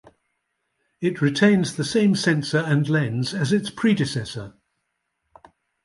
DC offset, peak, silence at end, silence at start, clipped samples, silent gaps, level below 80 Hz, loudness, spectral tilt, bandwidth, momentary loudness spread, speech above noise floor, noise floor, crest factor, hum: under 0.1%; -4 dBFS; 1.35 s; 1 s; under 0.1%; none; -60 dBFS; -21 LUFS; -6 dB/octave; 11.5 kHz; 10 LU; 55 dB; -76 dBFS; 18 dB; none